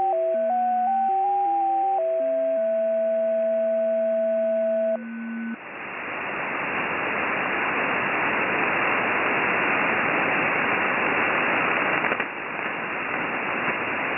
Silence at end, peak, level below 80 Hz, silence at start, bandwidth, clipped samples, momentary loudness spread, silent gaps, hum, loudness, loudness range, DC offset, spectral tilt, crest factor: 0 s; -6 dBFS; -62 dBFS; 0 s; 3.6 kHz; under 0.1%; 7 LU; none; none; -23 LUFS; 5 LU; under 0.1%; -8 dB/octave; 16 dB